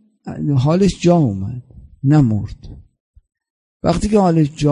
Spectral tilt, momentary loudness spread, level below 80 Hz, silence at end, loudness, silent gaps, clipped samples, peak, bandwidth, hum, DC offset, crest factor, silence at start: -7.5 dB/octave; 14 LU; -36 dBFS; 0 s; -16 LUFS; 3.00-3.14 s, 3.50-3.80 s; under 0.1%; -2 dBFS; 11 kHz; none; under 0.1%; 16 dB; 0.25 s